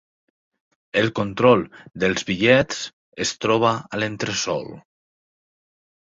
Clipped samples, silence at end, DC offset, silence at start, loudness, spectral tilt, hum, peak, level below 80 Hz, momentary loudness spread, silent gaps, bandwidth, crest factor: under 0.1%; 1.3 s; under 0.1%; 0.95 s; -21 LUFS; -4.5 dB/octave; none; -2 dBFS; -54 dBFS; 12 LU; 2.93-3.12 s; 7.8 kHz; 20 dB